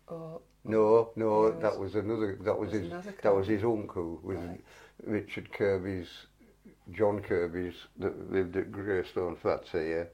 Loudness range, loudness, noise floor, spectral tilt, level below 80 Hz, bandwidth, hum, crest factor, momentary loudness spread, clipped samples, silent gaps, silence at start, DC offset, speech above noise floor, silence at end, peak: 6 LU; -31 LUFS; -58 dBFS; -7.5 dB/octave; -62 dBFS; 10 kHz; none; 20 dB; 16 LU; under 0.1%; none; 0.1 s; under 0.1%; 27 dB; 0 s; -12 dBFS